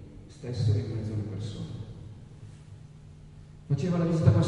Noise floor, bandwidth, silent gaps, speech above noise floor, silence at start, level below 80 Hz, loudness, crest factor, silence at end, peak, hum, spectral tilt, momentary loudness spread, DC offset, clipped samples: -49 dBFS; 9.6 kHz; none; 22 dB; 0 s; -48 dBFS; -30 LUFS; 22 dB; 0 s; -6 dBFS; none; -8 dB/octave; 23 LU; under 0.1%; under 0.1%